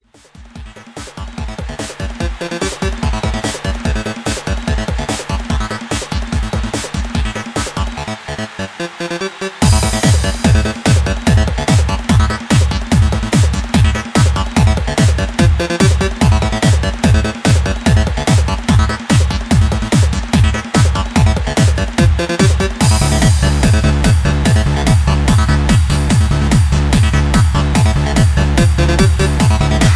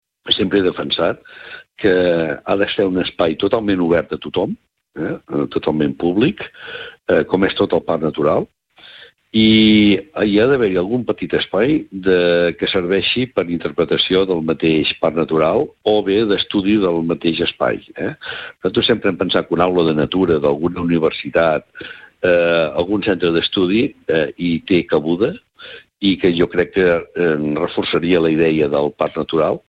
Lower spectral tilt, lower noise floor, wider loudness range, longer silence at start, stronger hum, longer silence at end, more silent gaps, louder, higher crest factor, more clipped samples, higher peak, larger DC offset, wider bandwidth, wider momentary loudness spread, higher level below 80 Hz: second, -5.5 dB/octave vs -8 dB/octave; about the same, -40 dBFS vs -43 dBFS; first, 8 LU vs 4 LU; first, 0.4 s vs 0.25 s; neither; second, 0 s vs 0.2 s; neither; first, -14 LUFS vs -17 LUFS; about the same, 12 dB vs 16 dB; neither; about the same, 0 dBFS vs 0 dBFS; neither; first, 11 kHz vs 5.2 kHz; about the same, 9 LU vs 9 LU; first, -18 dBFS vs -46 dBFS